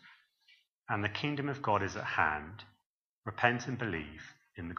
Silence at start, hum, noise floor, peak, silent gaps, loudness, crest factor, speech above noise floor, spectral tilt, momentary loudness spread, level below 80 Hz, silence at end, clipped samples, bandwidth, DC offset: 0.05 s; none; -83 dBFS; -10 dBFS; 0.72-0.82 s, 2.86-3.23 s; -34 LUFS; 26 dB; 49 dB; -5.5 dB/octave; 18 LU; -62 dBFS; 0 s; under 0.1%; 7.2 kHz; under 0.1%